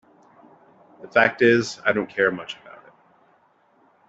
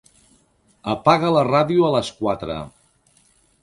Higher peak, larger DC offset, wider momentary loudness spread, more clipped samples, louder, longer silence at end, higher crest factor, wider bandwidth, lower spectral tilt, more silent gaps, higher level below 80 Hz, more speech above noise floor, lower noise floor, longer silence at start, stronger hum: second, -4 dBFS vs 0 dBFS; neither; first, 18 LU vs 15 LU; neither; about the same, -21 LUFS vs -19 LUFS; first, 1.55 s vs 0.95 s; about the same, 22 dB vs 22 dB; second, 8 kHz vs 11.5 kHz; second, -5 dB/octave vs -6.5 dB/octave; neither; second, -66 dBFS vs -52 dBFS; about the same, 40 dB vs 41 dB; about the same, -61 dBFS vs -60 dBFS; first, 1.05 s vs 0.85 s; neither